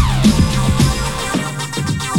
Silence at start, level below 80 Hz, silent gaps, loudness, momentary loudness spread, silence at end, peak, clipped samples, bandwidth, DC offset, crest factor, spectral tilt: 0 s; -24 dBFS; none; -16 LUFS; 7 LU; 0 s; 0 dBFS; under 0.1%; 18 kHz; under 0.1%; 14 dB; -5 dB/octave